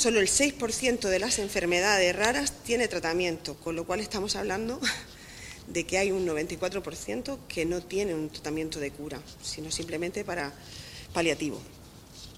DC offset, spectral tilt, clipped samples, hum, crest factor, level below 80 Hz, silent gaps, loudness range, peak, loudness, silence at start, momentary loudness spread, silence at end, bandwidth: under 0.1%; -2.5 dB/octave; under 0.1%; none; 22 dB; -52 dBFS; none; 7 LU; -8 dBFS; -29 LUFS; 0 s; 16 LU; 0 s; 16 kHz